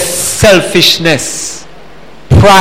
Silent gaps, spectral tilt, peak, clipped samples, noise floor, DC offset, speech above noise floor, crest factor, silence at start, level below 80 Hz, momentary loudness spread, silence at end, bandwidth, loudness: none; -3.5 dB/octave; 0 dBFS; 0.9%; -35 dBFS; 3%; 26 dB; 8 dB; 0 s; -26 dBFS; 13 LU; 0 s; 17 kHz; -7 LUFS